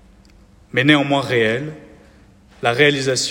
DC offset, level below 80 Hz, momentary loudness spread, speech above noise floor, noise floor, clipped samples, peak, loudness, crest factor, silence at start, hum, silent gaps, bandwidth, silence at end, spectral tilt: under 0.1%; -52 dBFS; 9 LU; 32 dB; -48 dBFS; under 0.1%; 0 dBFS; -17 LUFS; 18 dB; 0.75 s; none; none; 16.5 kHz; 0 s; -4 dB/octave